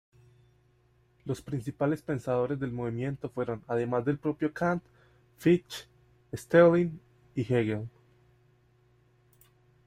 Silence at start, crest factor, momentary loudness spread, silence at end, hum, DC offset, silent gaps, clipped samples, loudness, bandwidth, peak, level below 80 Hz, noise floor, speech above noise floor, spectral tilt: 1.25 s; 22 dB; 18 LU; 1.95 s; none; under 0.1%; none; under 0.1%; -29 LUFS; 15 kHz; -8 dBFS; -64 dBFS; -66 dBFS; 38 dB; -7.5 dB/octave